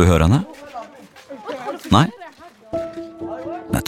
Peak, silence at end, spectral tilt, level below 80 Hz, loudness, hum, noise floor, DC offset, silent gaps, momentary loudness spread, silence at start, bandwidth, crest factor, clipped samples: 0 dBFS; 0 s; -6.5 dB/octave; -34 dBFS; -21 LUFS; none; -42 dBFS; under 0.1%; none; 22 LU; 0 s; 15 kHz; 20 dB; under 0.1%